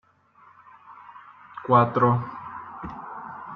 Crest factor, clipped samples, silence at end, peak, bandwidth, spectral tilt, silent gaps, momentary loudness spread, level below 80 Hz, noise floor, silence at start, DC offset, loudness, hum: 22 dB; under 0.1%; 0 s; -4 dBFS; 4.7 kHz; -10 dB/octave; none; 26 LU; -60 dBFS; -56 dBFS; 0.9 s; under 0.1%; -22 LUFS; none